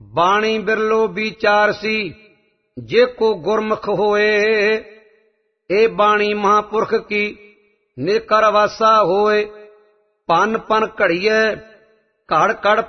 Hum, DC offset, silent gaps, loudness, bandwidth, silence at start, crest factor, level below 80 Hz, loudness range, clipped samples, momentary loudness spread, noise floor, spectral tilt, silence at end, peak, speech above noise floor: none; under 0.1%; none; -16 LUFS; 6.4 kHz; 0.15 s; 16 dB; -54 dBFS; 2 LU; under 0.1%; 7 LU; -63 dBFS; -4.5 dB/octave; 0 s; -2 dBFS; 47 dB